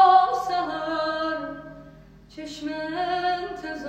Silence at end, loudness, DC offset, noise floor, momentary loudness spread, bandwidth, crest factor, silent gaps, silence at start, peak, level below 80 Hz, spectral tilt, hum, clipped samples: 0 s; -25 LUFS; under 0.1%; -48 dBFS; 18 LU; 8.8 kHz; 18 dB; none; 0 s; -6 dBFS; -56 dBFS; -4 dB/octave; none; under 0.1%